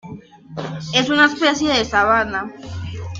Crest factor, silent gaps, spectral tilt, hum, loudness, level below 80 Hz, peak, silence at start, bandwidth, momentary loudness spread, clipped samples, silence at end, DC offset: 18 dB; none; -4 dB/octave; none; -16 LUFS; -46 dBFS; -2 dBFS; 0.05 s; 7.8 kHz; 17 LU; under 0.1%; 0 s; under 0.1%